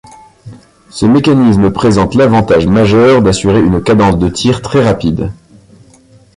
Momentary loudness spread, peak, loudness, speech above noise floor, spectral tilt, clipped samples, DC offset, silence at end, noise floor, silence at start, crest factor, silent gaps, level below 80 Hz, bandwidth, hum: 7 LU; 0 dBFS; -9 LUFS; 34 dB; -6.5 dB/octave; under 0.1%; under 0.1%; 1.05 s; -43 dBFS; 0.45 s; 10 dB; none; -30 dBFS; 11.5 kHz; none